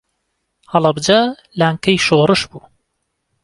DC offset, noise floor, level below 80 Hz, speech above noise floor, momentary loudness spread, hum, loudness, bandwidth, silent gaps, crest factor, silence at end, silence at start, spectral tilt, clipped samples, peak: under 0.1%; -71 dBFS; -52 dBFS; 57 dB; 7 LU; none; -15 LUFS; 11.5 kHz; none; 16 dB; 0.85 s; 0.7 s; -5 dB/octave; under 0.1%; 0 dBFS